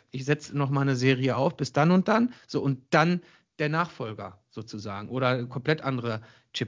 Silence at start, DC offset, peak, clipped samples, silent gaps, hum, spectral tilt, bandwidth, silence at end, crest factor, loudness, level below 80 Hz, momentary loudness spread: 0.15 s; under 0.1%; -6 dBFS; under 0.1%; none; none; -6.5 dB/octave; 7.6 kHz; 0 s; 20 dB; -26 LUFS; -66 dBFS; 15 LU